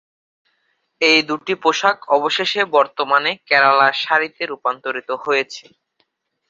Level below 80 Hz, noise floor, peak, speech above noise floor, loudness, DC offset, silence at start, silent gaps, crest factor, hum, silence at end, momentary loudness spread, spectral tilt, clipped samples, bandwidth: -70 dBFS; -68 dBFS; 0 dBFS; 50 dB; -17 LUFS; under 0.1%; 1 s; none; 18 dB; none; 0.9 s; 11 LU; -2.5 dB/octave; under 0.1%; 7.8 kHz